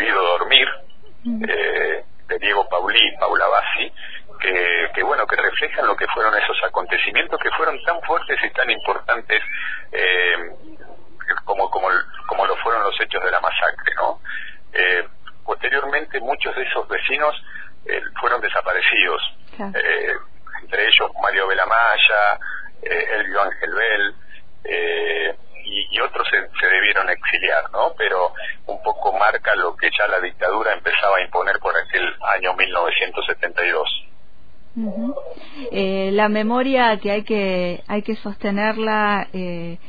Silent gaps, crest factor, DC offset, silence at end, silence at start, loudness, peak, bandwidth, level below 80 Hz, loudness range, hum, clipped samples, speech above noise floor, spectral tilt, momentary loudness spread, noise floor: none; 20 dB; 3%; 0.15 s; 0 s; -19 LUFS; 0 dBFS; 5 kHz; -50 dBFS; 4 LU; none; under 0.1%; 32 dB; -6 dB/octave; 12 LU; -52 dBFS